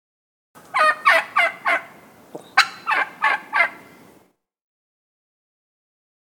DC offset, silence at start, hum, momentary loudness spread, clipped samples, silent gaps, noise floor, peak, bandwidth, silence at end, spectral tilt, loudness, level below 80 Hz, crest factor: under 0.1%; 0.75 s; none; 6 LU; under 0.1%; none; -58 dBFS; 0 dBFS; 19 kHz; 2.55 s; -0.5 dB/octave; -19 LUFS; -78 dBFS; 24 dB